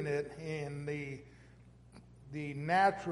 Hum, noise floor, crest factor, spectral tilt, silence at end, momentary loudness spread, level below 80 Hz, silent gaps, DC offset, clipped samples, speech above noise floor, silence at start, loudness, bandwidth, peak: none; -59 dBFS; 22 dB; -6.5 dB/octave; 0 s; 18 LU; -64 dBFS; none; under 0.1%; under 0.1%; 24 dB; 0 s; -36 LUFS; 11.5 kHz; -16 dBFS